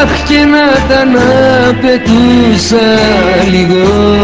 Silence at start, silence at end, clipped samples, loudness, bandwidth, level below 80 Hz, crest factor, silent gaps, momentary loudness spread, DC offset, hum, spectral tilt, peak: 0 s; 0 s; 0.9%; -7 LUFS; 8 kHz; -24 dBFS; 6 dB; none; 2 LU; 0.7%; none; -5.5 dB/octave; 0 dBFS